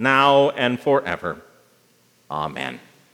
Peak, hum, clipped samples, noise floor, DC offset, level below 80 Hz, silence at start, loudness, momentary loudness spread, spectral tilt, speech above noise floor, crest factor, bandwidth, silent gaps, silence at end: -2 dBFS; none; under 0.1%; -59 dBFS; under 0.1%; -62 dBFS; 0 s; -20 LUFS; 17 LU; -5.5 dB/octave; 39 dB; 20 dB; 13 kHz; none; 0.35 s